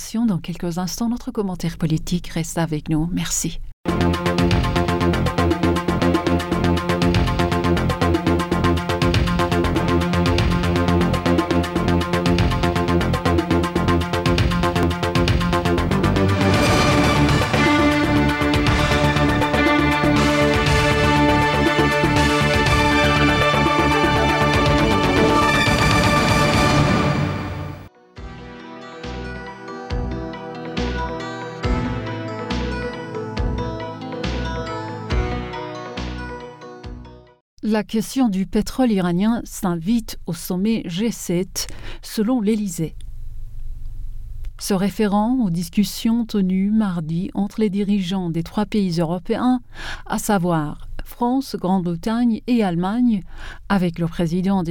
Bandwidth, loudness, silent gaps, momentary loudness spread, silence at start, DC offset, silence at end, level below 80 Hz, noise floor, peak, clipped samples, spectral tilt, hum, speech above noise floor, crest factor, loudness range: 18.5 kHz; -19 LUFS; 3.73-3.84 s, 37.41-37.57 s; 14 LU; 0 s; under 0.1%; 0 s; -32 dBFS; -39 dBFS; -6 dBFS; under 0.1%; -5.5 dB/octave; none; 18 dB; 14 dB; 10 LU